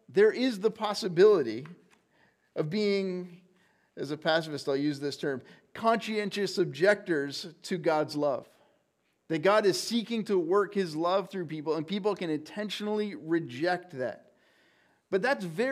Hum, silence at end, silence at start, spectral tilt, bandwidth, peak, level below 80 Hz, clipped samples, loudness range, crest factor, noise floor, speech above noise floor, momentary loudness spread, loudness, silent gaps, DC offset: none; 0 s; 0.1 s; -5 dB/octave; 15 kHz; -12 dBFS; -82 dBFS; under 0.1%; 4 LU; 18 dB; -74 dBFS; 46 dB; 12 LU; -29 LUFS; none; under 0.1%